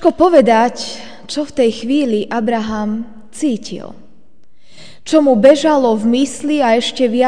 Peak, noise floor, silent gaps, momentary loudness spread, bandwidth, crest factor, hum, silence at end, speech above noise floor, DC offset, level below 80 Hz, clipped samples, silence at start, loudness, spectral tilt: 0 dBFS; -52 dBFS; none; 16 LU; 10 kHz; 14 dB; none; 0 s; 39 dB; 2%; -48 dBFS; 0.3%; 0 s; -14 LUFS; -5 dB/octave